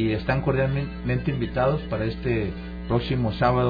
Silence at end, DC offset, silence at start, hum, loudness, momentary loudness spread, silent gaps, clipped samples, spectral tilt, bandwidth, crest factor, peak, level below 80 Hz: 0 s; under 0.1%; 0 s; none; -25 LUFS; 5 LU; none; under 0.1%; -9.5 dB/octave; 5 kHz; 16 dB; -8 dBFS; -36 dBFS